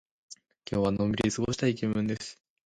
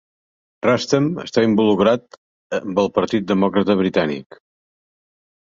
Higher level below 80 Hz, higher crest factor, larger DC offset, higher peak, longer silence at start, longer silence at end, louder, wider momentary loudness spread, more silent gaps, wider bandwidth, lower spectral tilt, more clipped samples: about the same, -54 dBFS vs -56 dBFS; about the same, 18 dB vs 18 dB; neither; second, -14 dBFS vs -2 dBFS; second, 0.3 s vs 0.65 s; second, 0.35 s vs 1.3 s; second, -29 LUFS vs -19 LUFS; first, 22 LU vs 8 LU; second, none vs 2.18-2.50 s; first, 11 kHz vs 7.6 kHz; about the same, -5.5 dB/octave vs -6 dB/octave; neither